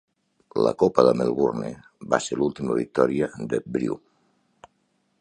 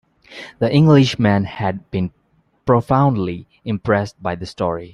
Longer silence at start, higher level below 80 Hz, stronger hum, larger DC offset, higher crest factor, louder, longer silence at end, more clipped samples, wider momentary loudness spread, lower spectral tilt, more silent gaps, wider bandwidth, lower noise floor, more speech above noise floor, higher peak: first, 0.55 s vs 0.3 s; second, -58 dBFS vs -48 dBFS; neither; neither; first, 24 dB vs 16 dB; second, -24 LUFS vs -18 LUFS; first, 1.25 s vs 0.05 s; neither; about the same, 13 LU vs 15 LU; second, -6 dB/octave vs -7.5 dB/octave; neither; about the same, 10.5 kHz vs 10.5 kHz; first, -70 dBFS vs -48 dBFS; first, 47 dB vs 31 dB; about the same, -2 dBFS vs -2 dBFS